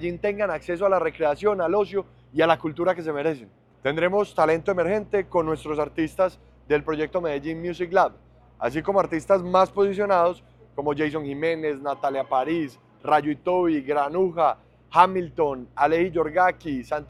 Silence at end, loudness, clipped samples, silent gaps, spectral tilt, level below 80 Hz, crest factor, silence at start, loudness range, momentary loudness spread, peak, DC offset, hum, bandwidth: 0.05 s; -24 LUFS; under 0.1%; none; -6.5 dB/octave; -54 dBFS; 22 dB; 0 s; 3 LU; 8 LU; -2 dBFS; under 0.1%; none; 12.5 kHz